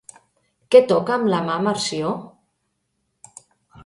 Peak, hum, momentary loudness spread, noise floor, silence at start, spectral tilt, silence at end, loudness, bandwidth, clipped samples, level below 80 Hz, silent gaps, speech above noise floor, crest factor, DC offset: 0 dBFS; none; 12 LU; -73 dBFS; 0.7 s; -5 dB/octave; 1.55 s; -19 LUFS; 11.5 kHz; under 0.1%; -64 dBFS; none; 55 dB; 22 dB; under 0.1%